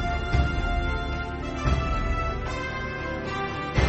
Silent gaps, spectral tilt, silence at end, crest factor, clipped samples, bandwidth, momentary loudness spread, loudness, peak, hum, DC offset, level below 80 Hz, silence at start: none; -6 dB/octave; 0 s; 18 dB; under 0.1%; 8.2 kHz; 5 LU; -28 LUFS; -8 dBFS; none; under 0.1%; -30 dBFS; 0 s